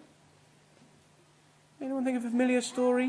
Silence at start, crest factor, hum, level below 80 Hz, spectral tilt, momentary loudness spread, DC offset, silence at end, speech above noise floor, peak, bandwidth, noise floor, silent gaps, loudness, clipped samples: 1.8 s; 16 dB; none; -80 dBFS; -4 dB/octave; 9 LU; under 0.1%; 0 s; 34 dB; -16 dBFS; 11 kHz; -62 dBFS; none; -30 LUFS; under 0.1%